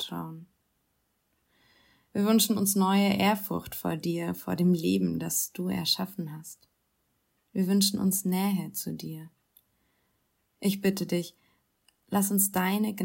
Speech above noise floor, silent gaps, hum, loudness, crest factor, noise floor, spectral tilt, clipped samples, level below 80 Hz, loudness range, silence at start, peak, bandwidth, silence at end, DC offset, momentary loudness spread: 47 dB; none; none; -27 LUFS; 18 dB; -75 dBFS; -4.5 dB/octave; under 0.1%; -68 dBFS; 6 LU; 0 s; -12 dBFS; 16.5 kHz; 0 s; under 0.1%; 15 LU